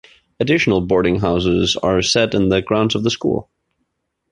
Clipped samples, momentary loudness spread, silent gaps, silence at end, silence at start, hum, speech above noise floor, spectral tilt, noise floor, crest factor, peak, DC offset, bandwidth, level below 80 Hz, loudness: under 0.1%; 5 LU; none; 0.9 s; 0.4 s; none; 55 dB; -5 dB/octave; -72 dBFS; 14 dB; -2 dBFS; under 0.1%; 11 kHz; -40 dBFS; -17 LUFS